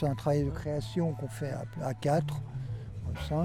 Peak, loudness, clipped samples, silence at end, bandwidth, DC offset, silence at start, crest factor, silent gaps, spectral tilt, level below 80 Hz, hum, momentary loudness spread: -16 dBFS; -33 LUFS; under 0.1%; 0 s; 14 kHz; under 0.1%; 0 s; 16 dB; none; -7.5 dB/octave; -48 dBFS; none; 9 LU